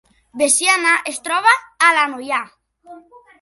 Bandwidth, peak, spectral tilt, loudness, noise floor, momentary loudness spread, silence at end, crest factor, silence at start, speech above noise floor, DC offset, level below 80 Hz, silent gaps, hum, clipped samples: 12 kHz; 0 dBFS; 1 dB/octave; -15 LUFS; -43 dBFS; 10 LU; 0.4 s; 18 dB; 0.35 s; 26 dB; under 0.1%; -68 dBFS; none; none; under 0.1%